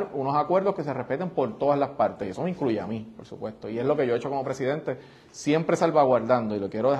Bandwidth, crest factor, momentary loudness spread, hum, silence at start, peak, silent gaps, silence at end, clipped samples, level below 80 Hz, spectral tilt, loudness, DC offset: 11 kHz; 18 dB; 14 LU; none; 0 s; -8 dBFS; none; 0 s; under 0.1%; -64 dBFS; -6.5 dB/octave; -26 LUFS; under 0.1%